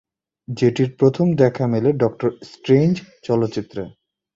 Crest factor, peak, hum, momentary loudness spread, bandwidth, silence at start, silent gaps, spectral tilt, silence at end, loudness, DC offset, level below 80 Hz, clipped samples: 16 dB; -2 dBFS; none; 15 LU; 7.8 kHz; 0.5 s; none; -8 dB/octave; 0.45 s; -19 LUFS; under 0.1%; -56 dBFS; under 0.1%